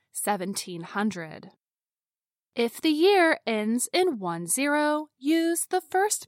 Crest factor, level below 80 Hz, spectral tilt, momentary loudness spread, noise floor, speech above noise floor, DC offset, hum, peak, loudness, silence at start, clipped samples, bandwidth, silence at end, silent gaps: 16 dB; -82 dBFS; -3 dB/octave; 11 LU; under -90 dBFS; over 64 dB; under 0.1%; none; -10 dBFS; -25 LUFS; 0.15 s; under 0.1%; 16.5 kHz; 0 s; none